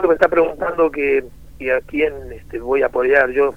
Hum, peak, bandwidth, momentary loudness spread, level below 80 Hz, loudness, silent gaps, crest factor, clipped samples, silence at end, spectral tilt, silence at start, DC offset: none; 0 dBFS; 11.5 kHz; 13 LU; -42 dBFS; -17 LUFS; none; 18 dB; under 0.1%; 0 s; -6.5 dB/octave; 0 s; 0.8%